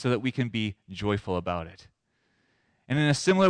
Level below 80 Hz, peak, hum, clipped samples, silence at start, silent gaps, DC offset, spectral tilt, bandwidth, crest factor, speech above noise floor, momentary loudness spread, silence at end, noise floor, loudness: -56 dBFS; -14 dBFS; none; under 0.1%; 0 s; none; under 0.1%; -5.5 dB/octave; 10.5 kHz; 14 dB; 46 dB; 10 LU; 0 s; -73 dBFS; -28 LUFS